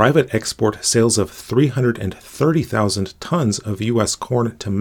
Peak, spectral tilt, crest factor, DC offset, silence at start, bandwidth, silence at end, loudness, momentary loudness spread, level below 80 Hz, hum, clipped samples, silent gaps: 0 dBFS; -5 dB/octave; 18 dB; under 0.1%; 0 s; 20 kHz; 0 s; -19 LUFS; 6 LU; -50 dBFS; none; under 0.1%; none